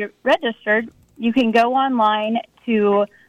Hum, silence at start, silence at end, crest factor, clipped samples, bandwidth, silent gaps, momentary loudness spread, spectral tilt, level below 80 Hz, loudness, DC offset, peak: none; 0 s; 0.25 s; 12 dB; under 0.1%; 9.8 kHz; none; 8 LU; -6 dB/octave; -62 dBFS; -19 LUFS; under 0.1%; -6 dBFS